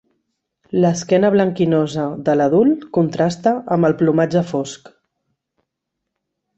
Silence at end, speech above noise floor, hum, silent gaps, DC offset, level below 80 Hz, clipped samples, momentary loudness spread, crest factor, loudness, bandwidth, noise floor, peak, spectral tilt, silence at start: 1.8 s; 62 dB; none; none; under 0.1%; -58 dBFS; under 0.1%; 8 LU; 16 dB; -17 LUFS; 8.2 kHz; -79 dBFS; -2 dBFS; -7 dB/octave; 0.75 s